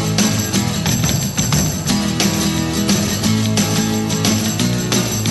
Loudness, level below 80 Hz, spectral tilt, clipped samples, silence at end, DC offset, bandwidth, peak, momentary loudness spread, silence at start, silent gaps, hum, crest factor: -16 LUFS; -36 dBFS; -4 dB/octave; under 0.1%; 0 s; under 0.1%; 12.5 kHz; 0 dBFS; 2 LU; 0 s; none; none; 16 dB